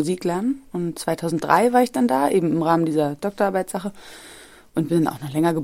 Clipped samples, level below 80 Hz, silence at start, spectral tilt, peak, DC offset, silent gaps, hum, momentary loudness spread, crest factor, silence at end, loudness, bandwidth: under 0.1%; -58 dBFS; 0 s; -6 dB/octave; -2 dBFS; under 0.1%; none; none; 12 LU; 20 dB; 0 s; -21 LUFS; 16.5 kHz